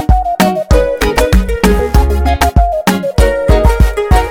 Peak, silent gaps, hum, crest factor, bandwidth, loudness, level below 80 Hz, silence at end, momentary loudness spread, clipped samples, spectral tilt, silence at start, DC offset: 0 dBFS; none; none; 10 dB; 17.5 kHz; -12 LUFS; -12 dBFS; 0 s; 2 LU; 0.2%; -6 dB/octave; 0 s; under 0.1%